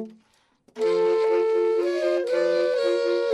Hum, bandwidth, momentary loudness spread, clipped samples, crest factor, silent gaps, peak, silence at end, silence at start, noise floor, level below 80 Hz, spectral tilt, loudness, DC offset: none; 10.5 kHz; 3 LU; under 0.1%; 10 dB; none; -12 dBFS; 0 s; 0 s; -62 dBFS; -84 dBFS; -4.5 dB/octave; -23 LUFS; under 0.1%